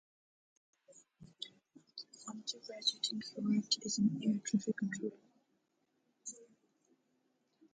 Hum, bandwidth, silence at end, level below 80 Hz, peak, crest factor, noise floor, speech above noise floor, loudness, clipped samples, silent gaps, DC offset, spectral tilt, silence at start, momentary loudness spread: none; 9.4 kHz; 1.3 s; -82 dBFS; -18 dBFS; 22 dB; -80 dBFS; 44 dB; -37 LUFS; under 0.1%; none; under 0.1%; -4 dB/octave; 0.9 s; 17 LU